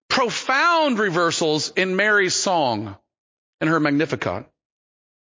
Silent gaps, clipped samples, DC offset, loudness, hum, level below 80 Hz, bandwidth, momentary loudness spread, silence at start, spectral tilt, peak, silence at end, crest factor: 3.18-3.58 s; under 0.1%; under 0.1%; -20 LUFS; none; -58 dBFS; 7.8 kHz; 9 LU; 0.1 s; -3.5 dB/octave; -4 dBFS; 0.95 s; 18 dB